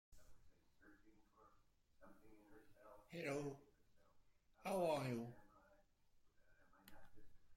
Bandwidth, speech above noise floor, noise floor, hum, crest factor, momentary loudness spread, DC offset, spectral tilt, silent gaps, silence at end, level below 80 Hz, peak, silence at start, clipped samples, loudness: 16.5 kHz; 30 dB; -75 dBFS; none; 22 dB; 26 LU; under 0.1%; -6 dB/octave; none; 0 s; -76 dBFS; -30 dBFS; 0.1 s; under 0.1%; -47 LUFS